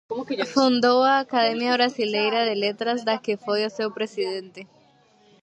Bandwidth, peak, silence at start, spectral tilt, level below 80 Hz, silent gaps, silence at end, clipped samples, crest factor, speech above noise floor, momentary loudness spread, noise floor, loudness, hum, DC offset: 8.8 kHz; -6 dBFS; 0.1 s; -4 dB/octave; -76 dBFS; none; 0.8 s; under 0.1%; 18 dB; 35 dB; 10 LU; -58 dBFS; -22 LUFS; none; under 0.1%